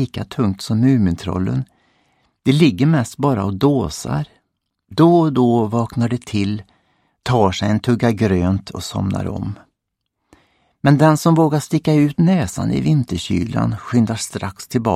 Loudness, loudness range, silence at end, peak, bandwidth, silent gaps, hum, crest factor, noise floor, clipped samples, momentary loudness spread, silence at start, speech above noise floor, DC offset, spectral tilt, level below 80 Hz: -17 LUFS; 3 LU; 0 s; 0 dBFS; 15 kHz; none; none; 18 dB; -76 dBFS; under 0.1%; 11 LU; 0 s; 60 dB; under 0.1%; -7 dB/octave; -44 dBFS